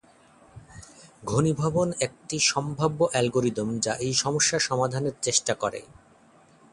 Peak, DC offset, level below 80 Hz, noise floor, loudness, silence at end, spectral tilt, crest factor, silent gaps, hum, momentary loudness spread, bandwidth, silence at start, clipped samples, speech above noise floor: -6 dBFS; under 0.1%; -56 dBFS; -57 dBFS; -25 LUFS; 0.9 s; -3.5 dB/octave; 20 dB; none; none; 8 LU; 11.5 kHz; 0.55 s; under 0.1%; 31 dB